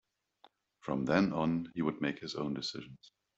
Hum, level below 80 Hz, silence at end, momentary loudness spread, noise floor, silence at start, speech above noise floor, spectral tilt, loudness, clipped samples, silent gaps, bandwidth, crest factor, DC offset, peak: none; -66 dBFS; 0.3 s; 15 LU; -67 dBFS; 0.85 s; 33 dB; -6 dB/octave; -34 LUFS; under 0.1%; none; 8.2 kHz; 22 dB; under 0.1%; -12 dBFS